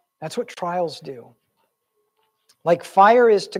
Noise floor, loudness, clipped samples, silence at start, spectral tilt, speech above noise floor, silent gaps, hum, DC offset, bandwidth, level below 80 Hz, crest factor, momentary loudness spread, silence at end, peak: -72 dBFS; -19 LUFS; under 0.1%; 0.2 s; -5 dB/octave; 54 dB; none; none; under 0.1%; 13 kHz; -76 dBFS; 20 dB; 23 LU; 0 s; -2 dBFS